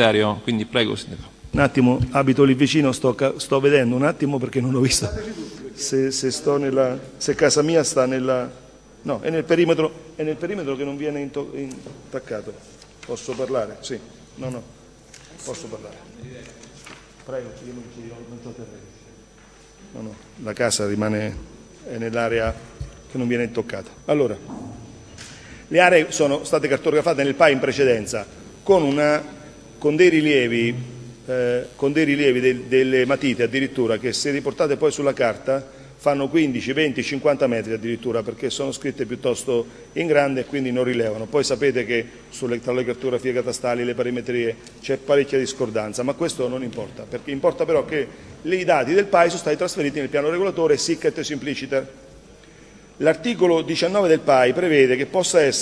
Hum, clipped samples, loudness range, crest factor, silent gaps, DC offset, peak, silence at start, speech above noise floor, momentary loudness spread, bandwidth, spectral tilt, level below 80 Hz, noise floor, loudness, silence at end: none; under 0.1%; 12 LU; 22 dB; none; under 0.1%; 0 dBFS; 0 s; 28 dB; 20 LU; 11 kHz; -4.5 dB/octave; -50 dBFS; -48 dBFS; -21 LUFS; 0 s